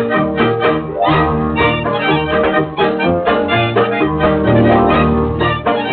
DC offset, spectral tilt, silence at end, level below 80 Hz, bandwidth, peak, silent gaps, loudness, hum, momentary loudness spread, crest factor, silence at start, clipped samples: under 0.1%; -4.5 dB/octave; 0 s; -32 dBFS; 4.9 kHz; 0 dBFS; none; -14 LUFS; none; 4 LU; 12 dB; 0 s; under 0.1%